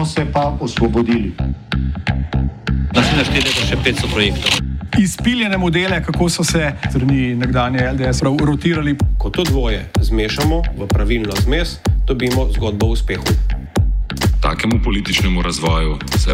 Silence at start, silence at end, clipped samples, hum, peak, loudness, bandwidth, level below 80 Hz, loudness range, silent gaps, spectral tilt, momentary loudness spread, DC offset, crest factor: 0 s; 0 s; under 0.1%; none; -2 dBFS; -17 LUFS; 16.5 kHz; -22 dBFS; 2 LU; none; -5 dB/octave; 4 LU; under 0.1%; 14 dB